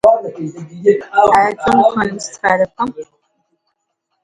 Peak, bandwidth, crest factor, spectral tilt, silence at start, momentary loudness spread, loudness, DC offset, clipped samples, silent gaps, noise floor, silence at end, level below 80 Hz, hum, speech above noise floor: 0 dBFS; 11.5 kHz; 16 dB; -5 dB/octave; 0.05 s; 15 LU; -14 LUFS; under 0.1%; under 0.1%; none; -71 dBFS; 1.2 s; -50 dBFS; none; 57 dB